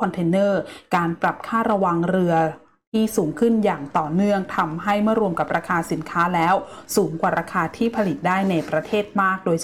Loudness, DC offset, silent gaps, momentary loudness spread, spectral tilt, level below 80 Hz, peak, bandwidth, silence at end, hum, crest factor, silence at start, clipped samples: -21 LUFS; 0.2%; 2.87-2.92 s; 5 LU; -6 dB/octave; -56 dBFS; -8 dBFS; 17 kHz; 0 s; none; 12 dB; 0 s; under 0.1%